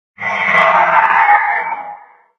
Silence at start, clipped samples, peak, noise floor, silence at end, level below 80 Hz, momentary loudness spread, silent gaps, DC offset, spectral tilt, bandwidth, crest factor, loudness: 0.2 s; under 0.1%; 0 dBFS; -35 dBFS; 0.4 s; -66 dBFS; 14 LU; none; under 0.1%; -4 dB/octave; 7.2 kHz; 14 dB; -11 LUFS